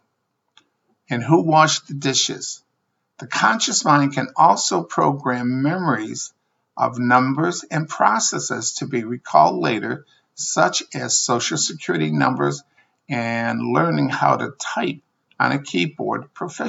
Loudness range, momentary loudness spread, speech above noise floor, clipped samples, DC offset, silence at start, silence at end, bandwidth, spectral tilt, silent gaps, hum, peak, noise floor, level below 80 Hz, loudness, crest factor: 3 LU; 12 LU; 54 dB; under 0.1%; under 0.1%; 1.1 s; 0 s; 8 kHz; -3.5 dB/octave; none; none; 0 dBFS; -73 dBFS; -74 dBFS; -20 LUFS; 20 dB